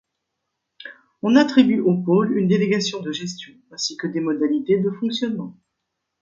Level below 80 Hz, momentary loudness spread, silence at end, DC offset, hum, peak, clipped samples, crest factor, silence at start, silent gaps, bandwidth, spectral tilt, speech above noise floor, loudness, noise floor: -66 dBFS; 21 LU; 0.7 s; under 0.1%; none; -2 dBFS; under 0.1%; 20 dB; 0.8 s; none; 7.6 kHz; -5.5 dB/octave; 59 dB; -20 LUFS; -78 dBFS